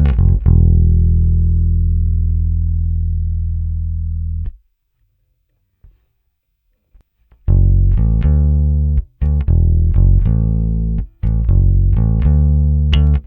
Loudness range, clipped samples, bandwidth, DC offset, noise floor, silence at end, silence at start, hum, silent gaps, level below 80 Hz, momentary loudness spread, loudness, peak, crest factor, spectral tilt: 11 LU; under 0.1%; 3.6 kHz; under 0.1%; -67 dBFS; 0.05 s; 0 s; none; none; -16 dBFS; 9 LU; -15 LUFS; 0 dBFS; 14 dB; -10.5 dB/octave